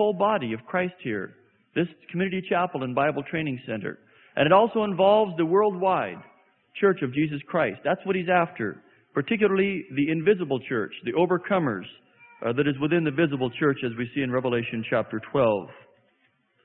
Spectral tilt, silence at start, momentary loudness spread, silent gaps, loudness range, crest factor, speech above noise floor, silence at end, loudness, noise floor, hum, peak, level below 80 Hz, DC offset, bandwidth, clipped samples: -11 dB/octave; 0 s; 11 LU; none; 4 LU; 20 dB; 43 dB; 0.9 s; -25 LUFS; -68 dBFS; none; -6 dBFS; -64 dBFS; under 0.1%; 4.1 kHz; under 0.1%